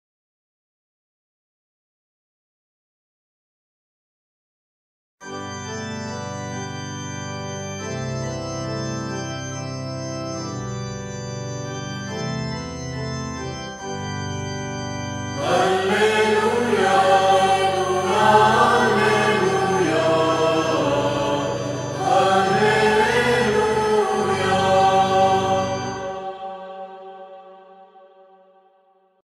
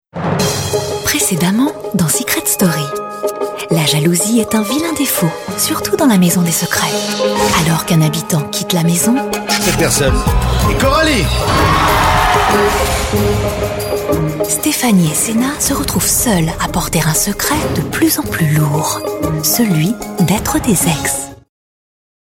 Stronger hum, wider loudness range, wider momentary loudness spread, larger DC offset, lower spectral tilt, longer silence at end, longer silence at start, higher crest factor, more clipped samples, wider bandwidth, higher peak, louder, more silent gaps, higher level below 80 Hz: neither; first, 15 LU vs 2 LU; first, 14 LU vs 6 LU; neither; about the same, -4.5 dB/octave vs -4 dB/octave; first, 1.35 s vs 1 s; first, 5.2 s vs 0.15 s; first, 20 dB vs 12 dB; neither; about the same, 16 kHz vs 17.5 kHz; about the same, -2 dBFS vs 0 dBFS; second, -21 LUFS vs -13 LUFS; neither; second, -50 dBFS vs -28 dBFS